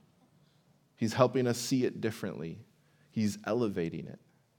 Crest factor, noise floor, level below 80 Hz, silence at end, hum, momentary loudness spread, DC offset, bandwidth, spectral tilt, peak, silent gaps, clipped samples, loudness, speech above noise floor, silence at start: 24 dB; -68 dBFS; -76 dBFS; 0.4 s; none; 16 LU; under 0.1%; over 20 kHz; -5.5 dB/octave; -10 dBFS; none; under 0.1%; -32 LUFS; 36 dB; 1 s